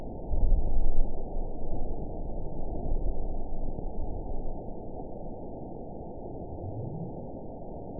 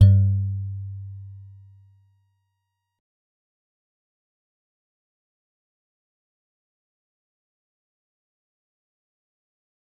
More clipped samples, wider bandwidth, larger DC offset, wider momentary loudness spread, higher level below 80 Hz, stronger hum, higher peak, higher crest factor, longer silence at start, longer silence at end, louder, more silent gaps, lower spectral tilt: neither; second, 1 kHz vs 4.7 kHz; first, 0.6% vs under 0.1%; second, 9 LU vs 24 LU; first, -30 dBFS vs -54 dBFS; neither; second, -10 dBFS vs -2 dBFS; second, 16 dB vs 24 dB; about the same, 0 s vs 0 s; second, 0 s vs 8.55 s; second, -38 LUFS vs -23 LUFS; neither; first, -16 dB/octave vs -10 dB/octave